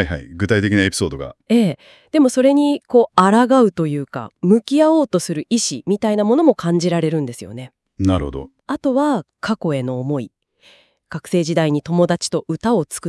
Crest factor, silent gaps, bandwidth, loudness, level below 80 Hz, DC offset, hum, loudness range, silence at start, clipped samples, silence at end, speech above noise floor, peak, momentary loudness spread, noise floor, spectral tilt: 18 dB; none; 12 kHz; -17 LUFS; -46 dBFS; under 0.1%; none; 6 LU; 0 s; under 0.1%; 0 s; 35 dB; 0 dBFS; 14 LU; -52 dBFS; -5.5 dB/octave